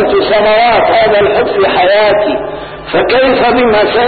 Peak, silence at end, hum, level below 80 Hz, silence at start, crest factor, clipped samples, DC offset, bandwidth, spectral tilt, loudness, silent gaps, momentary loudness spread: 0 dBFS; 0 s; none; -36 dBFS; 0 s; 8 dB; under 0.1%; under 0.1%; 4.8 kHz; -10.5 dB/octave; -9 LUFS; none; 7 LU